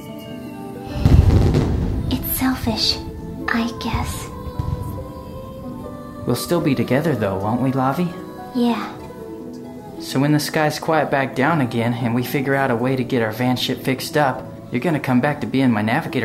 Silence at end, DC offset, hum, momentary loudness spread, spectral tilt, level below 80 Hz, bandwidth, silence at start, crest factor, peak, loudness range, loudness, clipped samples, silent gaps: 0 s; under 0.1%; none; 15 LU; -6 dB/octave; -30 dBFS; 16 kHz; 0 s; 20 dB; 0 dBFS; 5 LU; -20 LUFS; under 0.1%; none